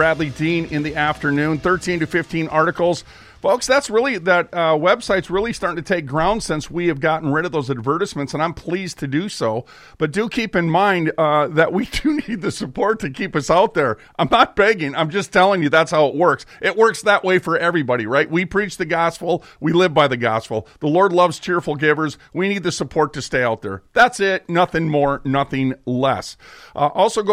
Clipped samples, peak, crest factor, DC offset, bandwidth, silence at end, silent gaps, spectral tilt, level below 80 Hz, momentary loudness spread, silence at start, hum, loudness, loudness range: under 0.1%; -2 dBFS; 16 dB; under 0.1%; 15 kHz; 0 s; none; -5 dB/octave; -46 dBFS; 8 LU; 0 s; none; -18 LUFS; 4 LU